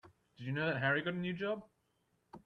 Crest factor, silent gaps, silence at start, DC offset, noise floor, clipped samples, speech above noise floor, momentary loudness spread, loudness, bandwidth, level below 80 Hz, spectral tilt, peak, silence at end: 18 dB; none; 0.05 s; under 0.1%; -79 dBFS; under 0.1%; 42 dB; 10 LU; -36 LUFS; 6.2 kHz; -74 dBFS; -8 dB/octave; -20 dBFS; 0.05 s